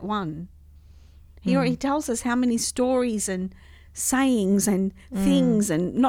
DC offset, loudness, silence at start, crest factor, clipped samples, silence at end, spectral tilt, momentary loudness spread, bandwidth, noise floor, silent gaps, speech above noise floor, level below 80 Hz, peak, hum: under 0.1%; -23 LUFS; 0 s; 16 dB; under 0.1%; 0 s; -5 dB/octave; 11 LU; 17 kHz; -49 dBFS; none; 26 dB; -48 dBFS; -8 dBFS; none